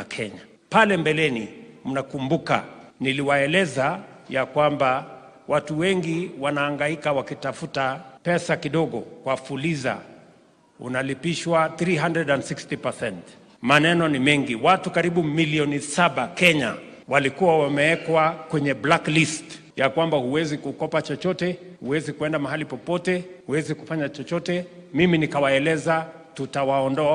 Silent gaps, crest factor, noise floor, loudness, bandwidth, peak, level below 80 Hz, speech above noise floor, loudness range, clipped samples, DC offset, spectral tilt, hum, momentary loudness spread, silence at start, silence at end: none; 22 dB; -55 dBFS; -23 LUFS; 13.5 kHz; -2 dBFS; -60 dBFS; 33 dB; 6 LU; under 0.1%; under 0.1%; -5 dB/octave; none; 11 LU; 0 s; 0 s